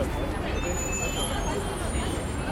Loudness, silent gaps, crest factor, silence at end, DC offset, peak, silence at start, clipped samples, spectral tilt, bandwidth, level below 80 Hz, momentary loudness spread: -29 LUFS; none; 14 dB; 0 s; under 0.1%; -14 dBFS; 0 s; under 0.1%; -4 dB/octave; 16.5 kHz; -34 dBFS; 2 LU